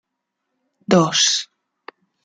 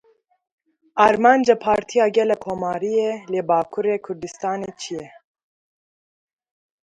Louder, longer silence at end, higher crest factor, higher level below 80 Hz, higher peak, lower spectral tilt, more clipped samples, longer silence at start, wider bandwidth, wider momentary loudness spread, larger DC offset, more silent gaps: first, -16 LUFS vs -20 LUFS; second, 0.8 s vs 1.75 s; about the same, 20 dB vs 20 dB; about the same, -60 dBFS vs -60 dBFS; about the same, -2 dBFS vs 0 dBFS; second, -3 dB/octave vs -5 dB/octave; neither; about the same, 0.9 s vs 0.95 s; about the same, 9.6 kHz vs 10.5 kHz; first, 23 LU vs 15 LU; neither; neither